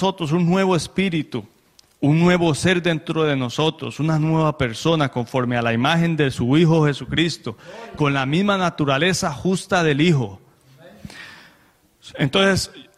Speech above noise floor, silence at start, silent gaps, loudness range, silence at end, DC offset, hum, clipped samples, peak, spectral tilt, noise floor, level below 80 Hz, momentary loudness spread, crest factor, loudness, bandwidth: 38 dB; 0 s; none; 3 LU; 0.15 s; under 0.1%; none; under 0.1%; -4 dBFS; -5.5 dB/octave; -57 dBFS; -50 dBFS; 14 LU; 16 dB; -19 LUFS; 13.5 kHz